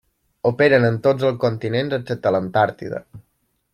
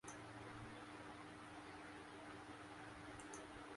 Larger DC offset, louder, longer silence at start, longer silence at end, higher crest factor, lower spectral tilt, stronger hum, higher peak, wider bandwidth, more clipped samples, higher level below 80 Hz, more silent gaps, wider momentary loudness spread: neither; first, -19 LUFS vs -55 LUFS; first, 0.45 s vs 0.05 s; first, 0.55 s vs 0 s; about the same, 18 dB vs 16 dB; first, -8 dB/octave vs -4 dB/octave; neither; first, -2 dBFS vs -38 dBFS; about the same, 12 kHz vs 11.5 kHz; neither; first, -58 dBFS vs -72 dBFS; neither; first, 10 LU vs 1 LU